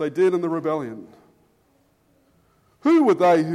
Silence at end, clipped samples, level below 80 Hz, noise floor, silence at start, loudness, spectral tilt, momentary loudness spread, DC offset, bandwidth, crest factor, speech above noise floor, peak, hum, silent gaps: 0 s; under 0.1%; -70 dBFS; -62 dBFS; 0 s; -20 LUFS; -7 dB/octave; 15 LU; under 0.1%; 11 kHz; 16 dB; 43 dB; -6 dBFS; none; none